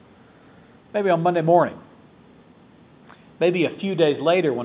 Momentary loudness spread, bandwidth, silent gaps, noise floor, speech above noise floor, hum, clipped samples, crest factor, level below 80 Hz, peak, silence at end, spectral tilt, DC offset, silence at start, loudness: 7 LU; 4 kHz; none; -51 dBFS; 31 dB; none; under 0.1%; 18 dB; -66 dBFS; -4 dBFS; 0 s; -10.5 dB/octave; under 0.1%; 0.95 s; -21 LUFS